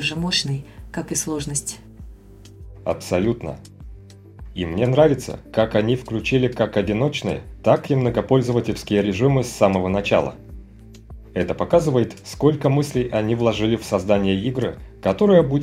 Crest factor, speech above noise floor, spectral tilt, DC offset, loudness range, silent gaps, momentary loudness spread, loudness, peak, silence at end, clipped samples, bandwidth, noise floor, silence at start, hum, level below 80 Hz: 20 dB; 23 dB; -5.5 dB/octave; under 0.1%; 7 LU; none; 11 LU; -21 LUFS; -2 dBFS; 0 s; under 0.1%; 16 kHz; -43 dBFS; 0 s; none; -42 dBFS